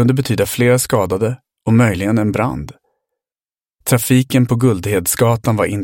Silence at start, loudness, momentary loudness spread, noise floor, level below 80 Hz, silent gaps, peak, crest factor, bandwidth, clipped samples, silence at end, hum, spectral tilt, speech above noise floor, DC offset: 0 s; -15 LUFS; 8 LU; under -90 dBFS; -44 dBFS; none; 0 dBFS; 16 dB; 17 kHz; under 0.1%; 0 s; none; -5.5 dB/octave; over 76 dB; under 0.1%